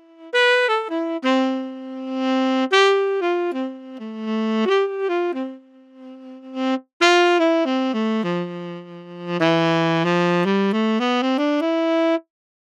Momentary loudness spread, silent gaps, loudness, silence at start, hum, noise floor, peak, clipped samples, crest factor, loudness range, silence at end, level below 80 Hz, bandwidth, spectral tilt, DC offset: 16 LU; 6.93-7.00 s; -20 LUFS; 0.2 s; none; -45 dBFS; -4 dBFS; under 0.1%; 16 dB; 4 LU; 0.5 s; under -90 dBFS; 10 kHz; -5.5 dB/octave; under 0.1%